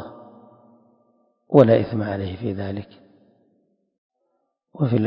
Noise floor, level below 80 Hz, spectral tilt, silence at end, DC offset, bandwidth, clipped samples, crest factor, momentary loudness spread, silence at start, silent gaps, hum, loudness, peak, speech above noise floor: -73 dBFS; -52 dBFS; -10.5 dB/octave; 0 s; under 0.1%; 5.4 kHz; under 0.1%; 24 dB; 17 LU; 0 s; 3.98-4.10 s; none; -20 LUFS; 0 dBFS; 54 dB